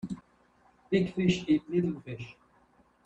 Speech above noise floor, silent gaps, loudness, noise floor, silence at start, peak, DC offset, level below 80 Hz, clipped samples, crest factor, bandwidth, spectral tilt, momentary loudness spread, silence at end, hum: 36 dB; none; -30 LUFS; -65 dBFS; 0.05 s; -12 dBFS; under 0.1%; -60 dBFS; under 0.1%; 18 dB; 8.2 kHz; -7 dB/octave; 16 LU; 0.75 s; none